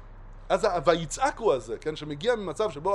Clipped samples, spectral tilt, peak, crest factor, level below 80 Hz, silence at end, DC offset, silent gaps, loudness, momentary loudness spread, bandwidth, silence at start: under 0.1%; -4.5 dB/octave; -6 dBFS; 20 dB; -46 dBFS; 0 s; under 0.1%; none; -27 LUFS; 9 LU; 12 kHz; 0 s